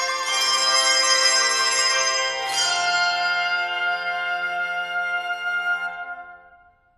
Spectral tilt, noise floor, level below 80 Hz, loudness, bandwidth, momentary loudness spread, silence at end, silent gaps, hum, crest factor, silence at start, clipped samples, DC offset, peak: 2.5 dB/octave; -54 dBFS; -68 dBFS; -20 LUFS; 15.5 kHz; 9 LU; 0.6 s; none; none; 16 dB; 0 s; under 0.1%; under 0.1%; -6 dBFS